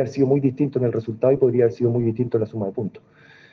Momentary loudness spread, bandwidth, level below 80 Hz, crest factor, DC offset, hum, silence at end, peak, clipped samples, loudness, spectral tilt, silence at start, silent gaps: 9 LU; 6.6 kHz; -60 dBFS; 16 dB; under 0.1%; none; 0.55 s; -6 dBFS; under 0.1%; -21 LUFS; -10 dB/octave; 0 s; none